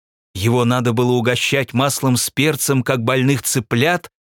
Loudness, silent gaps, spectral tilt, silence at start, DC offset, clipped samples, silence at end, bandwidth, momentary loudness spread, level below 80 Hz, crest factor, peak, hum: -17 LUFS; none; -4.5 dB/octave; 0.35 s; under 0.1%; under 0.1%; 0.15 s; 18.5 kHz; 2 LU; -56 dBFS; 16 dB; -2 dBFS; none